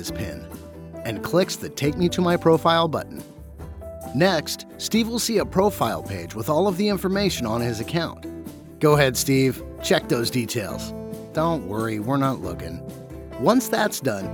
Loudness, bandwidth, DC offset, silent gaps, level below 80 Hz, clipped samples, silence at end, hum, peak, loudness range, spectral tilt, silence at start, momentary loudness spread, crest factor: -23 LUFS; over 20 kHz; under 0.1%; none; -46 dBFS; under 0.1%; 0 s; none; -4 dBFS; 3 LU; -5 dB/octave; 0 s; 18 LU; 20 dB